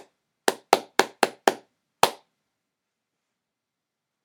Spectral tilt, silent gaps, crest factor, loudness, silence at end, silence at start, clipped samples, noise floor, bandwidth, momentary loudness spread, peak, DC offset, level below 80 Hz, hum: -1.5 dB/octave; none; 28 dB; -25 LUFS; 2.1 s; 0.45 s; under 0.1%; -85 dBFS; 19.5 kHz; 6 LU; 0 dBFS; under 0.1%; -70 dBFS; none